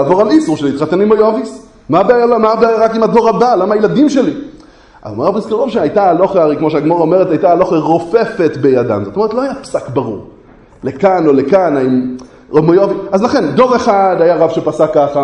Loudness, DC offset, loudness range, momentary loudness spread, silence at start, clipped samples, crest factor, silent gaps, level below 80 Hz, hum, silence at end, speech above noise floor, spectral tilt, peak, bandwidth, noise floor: -11 LUFS; under 0.1%; 3 LU; 8 LU; 0 s; 0.1%; 12 dB; none; -46 dBFS; none; 0 s; 29 dB; -7 dB/octave; 0 dBFS; 10 kHz; -39 dBFS